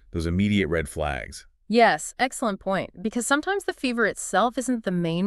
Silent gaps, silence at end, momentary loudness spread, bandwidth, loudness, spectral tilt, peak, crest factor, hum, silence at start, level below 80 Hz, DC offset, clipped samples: none; 0 s; 9 LU; 13.5 kHz; -24 LUFS; -4.5 dB/octave; -6 dBFS; 18 dB; none; 0.15 s; -44 dBFS; under 0.1%; under 0.1%